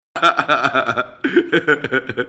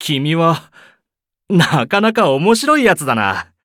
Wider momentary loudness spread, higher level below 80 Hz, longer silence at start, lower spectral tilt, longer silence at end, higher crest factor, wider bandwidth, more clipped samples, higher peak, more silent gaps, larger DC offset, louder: about the same, 5 LU vs 5 LU; about the same, -60 dBFS vs -56 dBFS; first, 0.15 s vs 0 s; about the same, -5 dB/octave vs -5 dB/octave; second, 0 s vs 0.2 s; about the same, 18 dB vs 14 dB; second, 8.6 kHz vs 17 kHz; neither; about the same, 0 dBFS vs -2 dBFS; neither; neither; second, -17 LUFS vs -14 LUFS